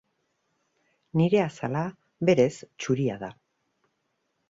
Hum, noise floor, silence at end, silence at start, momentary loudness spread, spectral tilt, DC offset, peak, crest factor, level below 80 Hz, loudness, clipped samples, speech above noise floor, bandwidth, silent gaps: none; -76 dBFS; 1.15 s; 1.15 s; 14 LU; -7 dB/octave; under 0.1%; -8 dBFS; 20 dB; -66 dBFS; -26 LUFS; under 0.1%; 51 dB; 7.8 kHz; none